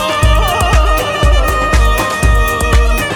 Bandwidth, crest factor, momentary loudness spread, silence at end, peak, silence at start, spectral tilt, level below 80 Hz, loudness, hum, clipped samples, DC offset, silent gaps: over 20 kHz; 10 dB; 1 LU; 0 s; 0 dBFS; 0 s; -4.5 dB/octave; -12 dBFS; -12 LUFS; none; under 0.1%; under 0.1%; none